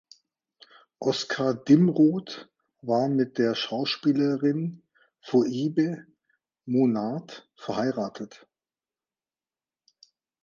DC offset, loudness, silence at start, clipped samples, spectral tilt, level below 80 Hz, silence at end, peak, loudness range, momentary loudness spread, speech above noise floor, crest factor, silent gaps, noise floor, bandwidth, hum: under 0.1%; -25 LUFS; 1 s; under 0.1%; -6.5 dB/octave; -72 dBFS; 2.15 s; -6 dBFS; 6 LU; 19 LU; over 65 dB; 20 dB; none; under -90 dBFS; 7.4 kHz; none